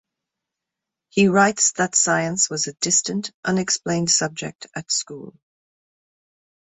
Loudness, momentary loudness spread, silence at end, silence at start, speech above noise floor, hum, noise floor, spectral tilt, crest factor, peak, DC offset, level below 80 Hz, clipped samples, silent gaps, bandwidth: -19 LUFS; 14 LU; 1.4 s; 1.15 s; 64 dB; none; -85 dBFS; -2.5 dB/octave; 20 dB; -4 dBFS; under 0.1%; -64 dBFS; under 0.1%; 3.34-3.43 s; 8.4 kHz